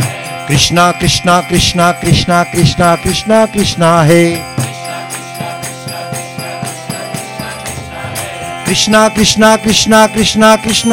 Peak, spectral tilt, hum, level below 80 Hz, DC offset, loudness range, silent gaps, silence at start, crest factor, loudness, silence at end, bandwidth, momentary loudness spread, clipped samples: 0 dBFS; -4 dB/octave; none; -32 dBFS; under 0.1%; 11 LU; none; 0 s; 12 dB; -10 LUFS; 0 s; 17 kHz; 14 LU; under 0.1%